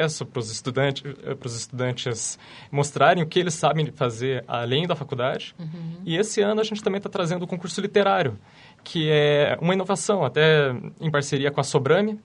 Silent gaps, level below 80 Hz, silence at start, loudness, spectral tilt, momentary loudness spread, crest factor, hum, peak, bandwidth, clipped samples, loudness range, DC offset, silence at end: none; -64 dBFS; 0 s; -23 LUFS; -5 dB/octave; 12 LU; 20 dB; none; -4 dBFS; 11 kHz; under 0.1%; 4 LU; under 0.1%; 0.05 s